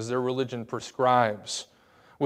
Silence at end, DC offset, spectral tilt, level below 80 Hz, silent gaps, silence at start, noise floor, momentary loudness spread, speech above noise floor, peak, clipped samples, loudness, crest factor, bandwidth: 0 s; under 0.1%; -4.5 dB/octave; -74 dBFS; none; 0 s; -58 dBFS; 13 LU; 31 dB; -8 dBFS; under 0.1%; -27 LUFS; 20 dB; 15 kHz